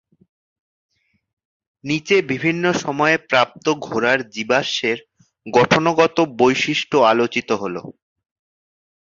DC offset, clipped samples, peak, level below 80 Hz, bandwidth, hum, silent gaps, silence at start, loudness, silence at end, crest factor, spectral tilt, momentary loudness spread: under 0.1%; under 0.1%; -2 dBFS; -60 dBFS; 7.6 kHz; none; none; 1.85 s; -18 LUFS; 1.15 s; 18 dB; -4.5 dB/octave; 8 LU